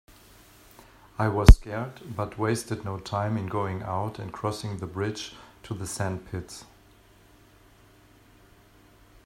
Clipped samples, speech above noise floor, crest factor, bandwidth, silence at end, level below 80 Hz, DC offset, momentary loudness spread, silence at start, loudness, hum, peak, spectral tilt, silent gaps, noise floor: under 0.1%; 32 dB; 26 dB; 15 kHz; 2.6 s; -30 dBFS; under 0.1%; 19 LU; 1.2 s; -27 LUFS; none; 0 dBFS; -6 dB/octave; none; -56 dBFS